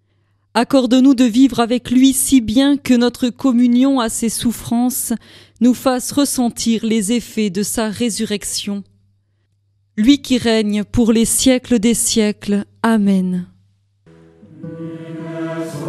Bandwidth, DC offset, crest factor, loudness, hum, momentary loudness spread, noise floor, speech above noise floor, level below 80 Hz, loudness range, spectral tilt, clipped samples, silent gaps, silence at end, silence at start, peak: 15.5 kHz; under 0.1%; 16 dB; -15 LUFS; none; 13 LU; -62 dBFS; 47 dB; -42 dBFS; 6 LU; -4 dB/octave; under 0.1%; none; 0 s; 0.55 s; 0 dBFS